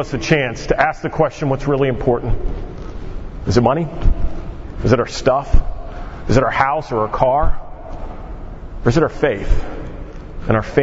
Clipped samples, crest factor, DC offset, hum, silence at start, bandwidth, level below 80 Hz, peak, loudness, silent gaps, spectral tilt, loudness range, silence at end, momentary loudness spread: under 0.1%; 16 dB; under 0.1%; none; 0 s; 7.8 kHz; -24 dBFS; 0 dBFS; -18 LUFS; none; -6.5 dB/octave; 3 LU; 0 s; 17 LU